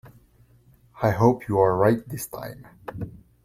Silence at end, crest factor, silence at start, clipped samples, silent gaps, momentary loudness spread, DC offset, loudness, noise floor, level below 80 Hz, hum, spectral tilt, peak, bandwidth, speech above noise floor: 0.25 s; 20 dB; 0.05 s; under 0.1%; none; 19 LU; under 0.1%; -22 LUFS; -57 dBFS; -54 dBFS; none; -7.5 dB/octave; -4 dBFS; 16.5 kHz; 35 dB